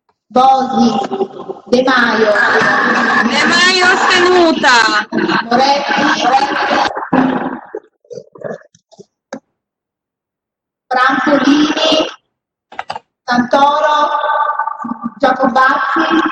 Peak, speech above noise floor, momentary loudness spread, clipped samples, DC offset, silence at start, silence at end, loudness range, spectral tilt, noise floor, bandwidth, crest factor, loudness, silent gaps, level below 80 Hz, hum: 0 dBFS; 71 dB; 18 LU; under 0.1%; under 0.1%; 0.3 s; 0 s; 9 LU; -3 dB/octave; -82 dBFS; 9.8 kHz; 12 dB; -12 LUFS; none; -54 dBFS; none